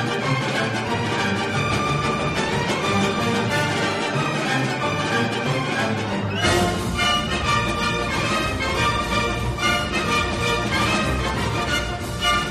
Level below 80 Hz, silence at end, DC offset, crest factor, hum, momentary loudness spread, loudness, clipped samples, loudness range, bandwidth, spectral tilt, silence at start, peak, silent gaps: -36 dBFS; 0 s; under 0.1%; 14 dB; none; 3 LU; -21 LUFS; under 0.1%; 1 LU; 14 kHz; -4.5 dB/octave; 0 s; -6 dBFS; none